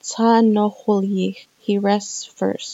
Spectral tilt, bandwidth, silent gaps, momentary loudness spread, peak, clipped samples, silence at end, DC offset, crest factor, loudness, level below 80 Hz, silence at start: -5.5 dB/octave; 8 kHz; none; 11 LU; -4 dBFS; under 0.1%; 0 s; under 0.1%; 16 dB; -19 LUFS; -84 dBFS; 0.05 s